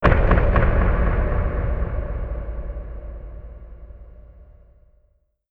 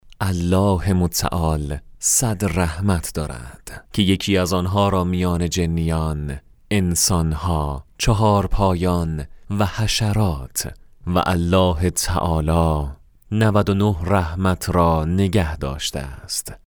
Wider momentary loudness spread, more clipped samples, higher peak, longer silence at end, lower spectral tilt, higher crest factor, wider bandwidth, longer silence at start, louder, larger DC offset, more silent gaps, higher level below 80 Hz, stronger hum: first, 24 LU vs 10 LU; neither; about the same, 0 dBFS vs -2 dBFS; first, 1.05 s vs 0.2 s; first, -9.5 dB/octave vs -5 dB/octave; about the same, 20 dB vs 18 dB; second, 4.5 kHz vs over 20 kHz; about the same, 0 s vs 0.05 s; second, -23 LUFS vs -20 LUFS; neither; neither; first, -24 dBFS vs -32 dBFS; neither